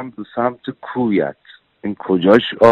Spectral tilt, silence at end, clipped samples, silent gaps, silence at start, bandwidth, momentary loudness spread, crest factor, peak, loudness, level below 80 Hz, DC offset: -7.5 dB/octave; 0 s; under 0.1%; none; 0 s; 8.4 kHz; 15 LU; 16 dB; 0 dBFS; -17 LUFS; -54 dBFS; under 0.1%